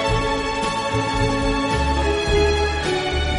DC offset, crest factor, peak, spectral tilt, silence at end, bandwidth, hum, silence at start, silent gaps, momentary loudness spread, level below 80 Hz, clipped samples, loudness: under 0.1%; 14 dB; -6 dBFS; -5 dB/octave; 0 s; 11.5 kHz; none; 0 s; none; 4 LU; -26 dBFS; under 0.1%; -20 LUFS